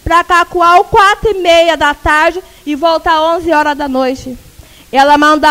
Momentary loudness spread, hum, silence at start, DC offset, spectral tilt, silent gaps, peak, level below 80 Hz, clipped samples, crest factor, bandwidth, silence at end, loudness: 9 LU; none; 0.05 s; under 0.1%; -3.5 dB/octave; none; 0 dBFS; -32 dBFS; 0.5%; 10 dB; 16.5 kHz; 0 s; -9 LUFS